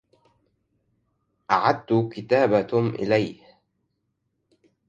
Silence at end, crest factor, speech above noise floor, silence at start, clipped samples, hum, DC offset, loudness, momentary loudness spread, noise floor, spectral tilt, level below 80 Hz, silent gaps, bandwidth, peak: 1.55 s; 22 dB; 54 dB; 1.5 s; under 0.1%; none; under 0.1%; -23 LUFS; 5 LU; -75 dBFS; -7.5 dB/octave; -62 dBFS; none; 7.4 kHz; -4 dBFS